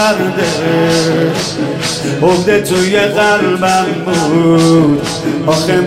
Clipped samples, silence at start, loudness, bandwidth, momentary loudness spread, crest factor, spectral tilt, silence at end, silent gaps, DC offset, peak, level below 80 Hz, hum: under 0.1%; 0 s; -12 LUFS; 16 kHz; 7 LU; 10 dB; -5 dB/octave; 0 s; none; under 0.1%; 0 dBFS; -42 dBFS; none